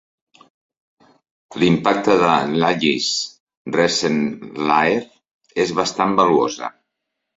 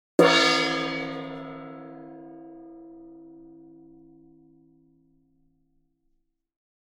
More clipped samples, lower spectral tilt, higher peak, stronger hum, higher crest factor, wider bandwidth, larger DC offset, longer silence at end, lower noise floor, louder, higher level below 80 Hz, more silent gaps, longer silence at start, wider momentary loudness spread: neither; about the same, -4.5 dB/octave vs -3.5 dB/octave; about the same, -2 dBFS vs -4 dBFS; neither; second, 18 dB vs 26 dB; second, 7.8 kHz vs 16.5 kHz; neither; second, 0.65 s vs 3.6 s; first, -78 dBFS vs -72 dBFS; first, -18 LUFS vs -22 LUFS; first, -56 dBFS vs -68 dBFS; first, 3.40-3.47 s, 3.57-3.65 s, 5.31-5.39 s vs none; first, 1.5 s vs 0.2 s; second, 13 LU vs 28 LU